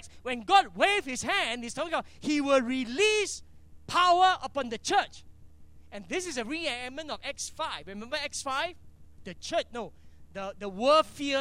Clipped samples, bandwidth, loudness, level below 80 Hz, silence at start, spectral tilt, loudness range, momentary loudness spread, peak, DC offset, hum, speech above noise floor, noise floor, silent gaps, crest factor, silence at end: under 0.1%; 15.5 kHz; -28 LUFS; -58 dBFS; 0 s; -2.5 dB/octave; 8 LU; 16 LU; -8 dBFS; under 0.1%; none; 21 dB; -50 dBFS; none; 20 dB; 0 s